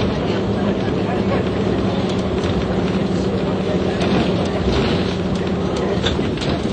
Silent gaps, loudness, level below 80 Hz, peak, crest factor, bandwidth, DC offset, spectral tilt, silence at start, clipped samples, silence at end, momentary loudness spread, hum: none; -19 LUFS; -32 dBFS; -6 dBFS; 14 dB; 9.2 kHz; under 0.1%; -7 dB/octave; 0 s; under 0.1%; 0 s; 3 LU; none